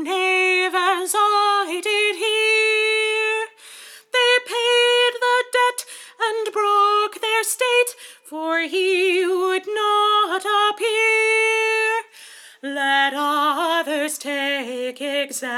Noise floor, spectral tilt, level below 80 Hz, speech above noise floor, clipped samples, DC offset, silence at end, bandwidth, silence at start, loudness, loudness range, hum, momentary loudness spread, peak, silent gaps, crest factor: -44 dBFS; 1 dB/octave; under -90 dBFS; 22 dB; under 0.1%; under 0.1%; 0 s; 18.5 kHz; 0 s; -19 LUFS; 3 LU; none; 8 LU; -6 dBFS; none; 14 dB